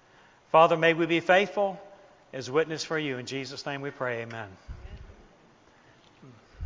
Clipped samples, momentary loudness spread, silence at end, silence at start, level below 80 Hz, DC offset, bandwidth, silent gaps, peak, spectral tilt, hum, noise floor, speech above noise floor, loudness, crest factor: under 0.1%; 23 LU; 0 s; 0.55 s; -56 dBFS; under 0.1%; 7.6 kHz; none; -6 dBFS; -5 dB/octave; none; -58 dBFS; 32 dB; -26 LUFS; 22 dB